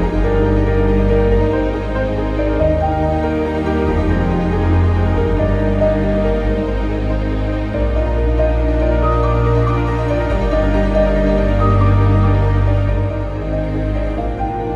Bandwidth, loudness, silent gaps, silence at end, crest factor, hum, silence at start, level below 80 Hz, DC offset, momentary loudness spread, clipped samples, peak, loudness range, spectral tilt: 7 kHz; -16 LUFS; none; 0 s; 12 dB; none; 0 s; -20 dBFS; under 0.1%; 6 LU; under 0.1%; -2 dBFS; 2 LU; -9 dB/octave